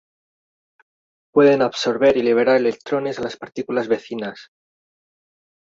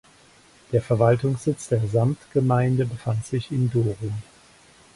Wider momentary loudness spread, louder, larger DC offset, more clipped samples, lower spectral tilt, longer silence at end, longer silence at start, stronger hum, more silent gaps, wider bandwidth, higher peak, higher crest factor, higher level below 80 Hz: first, 14 LU vs 8 LU; first, -19 LUFS vs -23 LUFS; neither; neither; second, -5.5 dB/octave vs -8 dB/octave; first, 1.2 s vs 0.75 s; first, 1.35 s vs 0.7 s; neither; neither; second, 7.8 kHz vs 11.5 kHz; first, -2 dBFS vs -6 dBFS; about the same, 18 dB vs 18 dB; second, -62 dBFS vs -52 dBFS